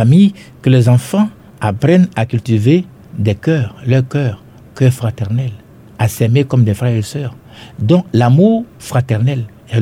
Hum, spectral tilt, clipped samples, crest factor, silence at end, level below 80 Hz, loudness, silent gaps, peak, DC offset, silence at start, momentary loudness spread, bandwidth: none; -7.5 dB/octave; under 0.1%; 12 dB; 0 s; -48 dBFS; -14 LUFS; none; 0 dBFS; under 0.1%; 0 s; 10 LU; 14.5 kHz